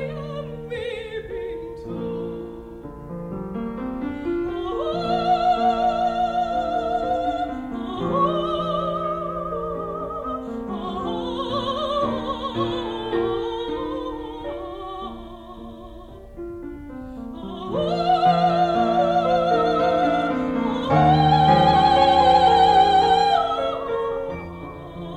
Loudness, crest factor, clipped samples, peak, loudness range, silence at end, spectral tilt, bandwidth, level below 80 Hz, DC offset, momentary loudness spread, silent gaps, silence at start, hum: -22 LUFS; 16 dB; under 0.1%; -6 dBFS; 15 LU; 0 s; -6.5 dB/octave; 9.2 kHz; -44 dBFS; under 0.1%; 20 LU; none; 0 s; none